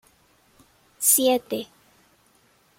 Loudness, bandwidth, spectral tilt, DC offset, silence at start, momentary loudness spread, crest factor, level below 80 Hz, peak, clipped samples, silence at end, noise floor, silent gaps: -21 LUFS; 16.5 kHz; -1 dB/octave; under 0.1%; 1 s; 16 LU; 22 dB; -70 dBFS; -4 dBFS; under 0.1%; 1.15 s; -61 dBFS; none